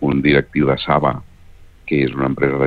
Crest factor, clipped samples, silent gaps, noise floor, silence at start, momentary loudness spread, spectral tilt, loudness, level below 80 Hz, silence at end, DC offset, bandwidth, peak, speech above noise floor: 16 dB; under 0.1%; none; -42 dBFS; 0 s; 8 LU; -9 dB/octave; -17 LUFS; -40 dBFS; 0 s; under 0.1%; 4.9 kHz; -2 dBFS; 26 dB